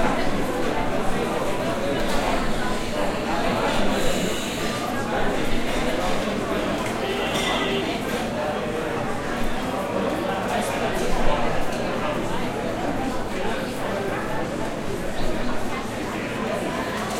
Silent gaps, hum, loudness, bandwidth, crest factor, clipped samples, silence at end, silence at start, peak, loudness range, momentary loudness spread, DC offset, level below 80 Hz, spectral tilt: none; none; -25 LUFS; 16 kHz; 16 dB; under 0.1%; 0 s; 0 s; -6 dBFS; 3 LU; 4 LU; under 0.1%; -34 dBFS; -4.5 dB/octave